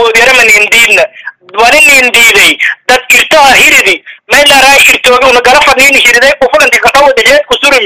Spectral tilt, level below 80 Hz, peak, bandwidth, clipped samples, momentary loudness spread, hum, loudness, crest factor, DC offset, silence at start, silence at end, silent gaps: 0 dB/octave; -34 dBFS; 0 dBFS; over 20 kHz; 8%; 7 LU; none; -2 LUFS; 4 dB; 0.6%; 0 s; 0 s; none